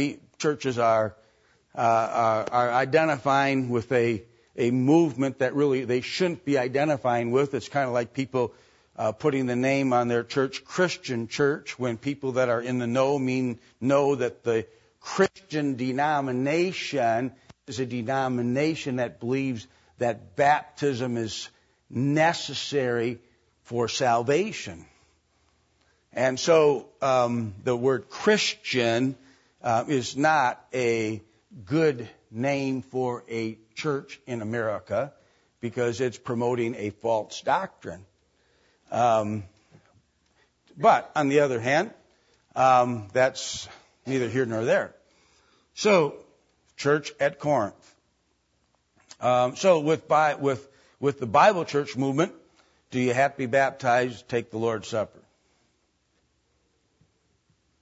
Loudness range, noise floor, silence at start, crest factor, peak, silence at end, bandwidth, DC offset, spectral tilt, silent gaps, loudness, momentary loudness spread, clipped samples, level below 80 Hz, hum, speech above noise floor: 5 LU; -71 dBFS; 0 s; 20 dB; -6 dBFS; 2.75 s; 8 kHz; under 0.1%; -5.5 dB/octave; none; -25 LUFS; 11 LU; under 0.1%; -66 dBFS; none; 46 dB